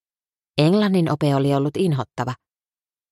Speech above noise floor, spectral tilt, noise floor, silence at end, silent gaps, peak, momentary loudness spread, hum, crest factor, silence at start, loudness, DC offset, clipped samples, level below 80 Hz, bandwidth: over 71 dB; -7.5 dB/octave; under -90 dBFS; 0.8 s; none; -2 dBFS; 11 LU; none; 20 dB; 0.55 s; -20 LUFS; under 0.1%; under 0.1%; -60 dBFS; 12.5 kHz